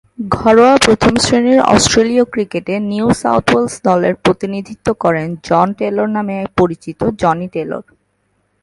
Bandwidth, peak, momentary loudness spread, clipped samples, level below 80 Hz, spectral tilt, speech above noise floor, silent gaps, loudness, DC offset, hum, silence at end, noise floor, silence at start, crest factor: 11.5 kHz; 0 dBFS; 10 LU; under 0.1%; -40 dBFS; -4.5 dB/octave; 50 dB; none; -13 LUFS; under 0.1%; none; 0.8 s; -63 dBFS; 0.2 s; 14 dB